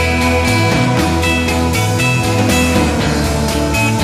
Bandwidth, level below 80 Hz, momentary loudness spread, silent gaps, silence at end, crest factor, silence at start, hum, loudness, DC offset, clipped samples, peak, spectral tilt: 15.5 kHz; -24 dBFS; 3 LU; none; 0 s; 12 dB; 0 s; none; -13 LUFS; under 0.1%; under 0.1%; -2 dBFS; -5 dB/octave